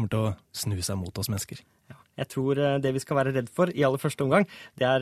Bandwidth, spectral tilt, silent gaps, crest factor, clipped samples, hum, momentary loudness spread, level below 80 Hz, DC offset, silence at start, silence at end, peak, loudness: 14 kHz; -5.5 dB/octave; none; 20 dB; under 0.1%; none; 10 LU; -58 dBFS; under 0.1%; 0 s; 0 s; -6 dBFS; -27 LUFS